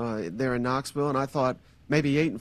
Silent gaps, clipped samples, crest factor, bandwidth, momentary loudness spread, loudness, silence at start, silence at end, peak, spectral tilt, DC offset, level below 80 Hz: none; under 0.1%; 18 dB; 14.5 kHz; 5 LU; -27 LUFS; 0 s; 0 s; -10 dBFS; -6.5 dB/octave; under 0.1%; -54 dBFS